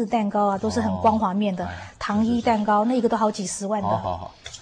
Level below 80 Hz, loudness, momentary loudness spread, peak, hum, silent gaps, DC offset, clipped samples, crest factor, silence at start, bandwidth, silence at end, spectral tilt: -52 dBFS; -23 LUFS; 10 LU; -6 dBFS; none; none; under 0.1%; under 0.1%; 16 dB; 0 s; 10.5 kHz; 0 s; -5.5 dB/octave